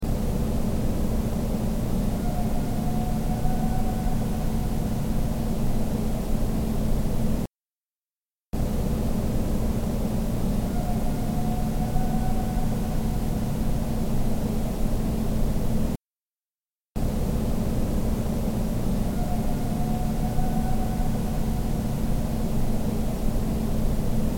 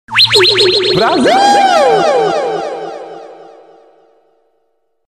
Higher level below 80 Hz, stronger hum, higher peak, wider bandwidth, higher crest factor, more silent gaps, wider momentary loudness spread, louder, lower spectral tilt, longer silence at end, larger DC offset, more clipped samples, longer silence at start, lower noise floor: first, -28 dBFS vs -52 dBFS; neither; second, -10 dBFS vs 0 dBFS; about the same, 17 kHz vs 15.5 kHz; about the same, 14 dB vs 12 dB; first, 7.85-7.89 s, 8.18-8.22 s, 16.52-16.59 s, 16.68-16.72 s, 16.91-16.95 s vs none; second, 1 LU vs 18 LU; second, -28 LUFS vs -9 LUFS; first, -7 dB/octave vs -3 dB/octave; second, 0 s vs 1.65 s; neither; neither; about the same, 0 s vs 0.1 s; first, under -90 dBFS vs -63 dBFS